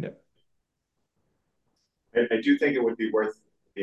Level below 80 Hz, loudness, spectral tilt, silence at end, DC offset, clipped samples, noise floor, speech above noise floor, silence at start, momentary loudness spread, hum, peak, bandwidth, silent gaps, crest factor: -74 dBFS; -25 LUFS; -7 dB/octave; 0 s; under 0.1%; under 0.1%; -80 dBFS; 55 dB; 0 s; 12 LU; none; -10 dBFS; 8 kHz; none; 18 dB